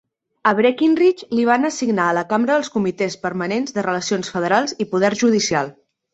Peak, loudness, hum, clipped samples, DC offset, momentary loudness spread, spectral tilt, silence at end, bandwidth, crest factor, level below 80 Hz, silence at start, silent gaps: -2 dBFS; -19 LUFS; none; under 0.1%; under 0.1%; 6 LU; -4.5 dB/octave; 0.4 s; 8.2 kHz; 16 dB; -62 dBFS; 0.45 s; none